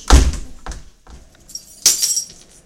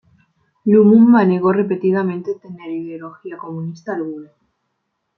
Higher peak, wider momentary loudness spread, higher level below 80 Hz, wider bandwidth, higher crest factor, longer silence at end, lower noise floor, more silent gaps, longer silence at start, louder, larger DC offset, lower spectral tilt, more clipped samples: about the same, 0 dBFS vs -2 dBFS; about the same, 22 LU vs 21 LU; first, -20 dBFS vs -64 dBFS; first, 17 kHz vs 5.8 kHz; about the same, 18 dB vs 16 dB; second, 0.4 s vs 0.95 s; second, -42 dBFS vs -73 dBFS; neither; second, 0 s vs 0.65 s; about the same, -15 LUFS vs -15 LUFS; neither; second, -2.5 dB/octave vs -10 dB/octave; first, 0.2% vs under 0.1%